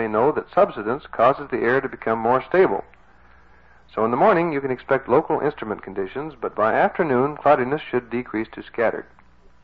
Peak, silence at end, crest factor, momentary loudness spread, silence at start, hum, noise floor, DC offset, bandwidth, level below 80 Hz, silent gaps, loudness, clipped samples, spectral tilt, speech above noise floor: -6 dBFS; 0.6 s; 16 dB; 11 LU; 0 s; 60 Hz at -55 dBFS; -53 dBFS; 0.2%; 5.4 kHz; -56 dBFS; none; -21 LUFS; under 0.1%; -9 dB/octave; 32 dB